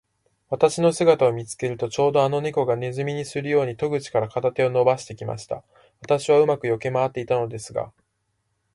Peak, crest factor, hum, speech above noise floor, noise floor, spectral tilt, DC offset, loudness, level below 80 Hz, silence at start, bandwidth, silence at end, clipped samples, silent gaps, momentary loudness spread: -4 dBFS; 20 dB; none; 51 dB; -73 dBFS; -5.5 dB/octave; under 0.1%; -22 LUFS; -60 dBFS; 0.5 s; 11.5 kHz; 0.85 s; under 0.1%; none; 13 LU